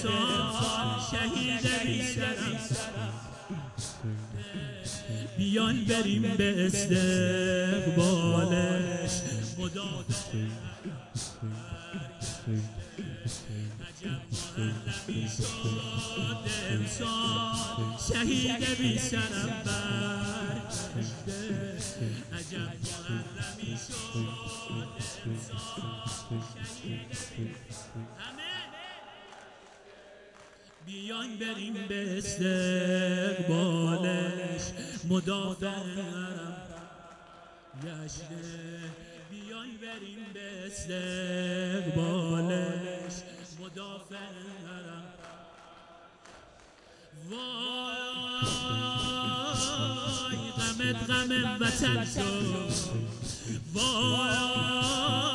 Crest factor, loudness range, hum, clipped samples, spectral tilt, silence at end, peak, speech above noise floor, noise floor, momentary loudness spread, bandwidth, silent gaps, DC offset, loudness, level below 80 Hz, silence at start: 20 dB; 13 LU; none; under 0.1%; -4 dB/octave; 0 s; -12 dBFS; 26 dB; -56 dBFS; 16 LU; 11.5 kHz; none; under 0.1%; -32 LUFS; -54 dBFS; 0 s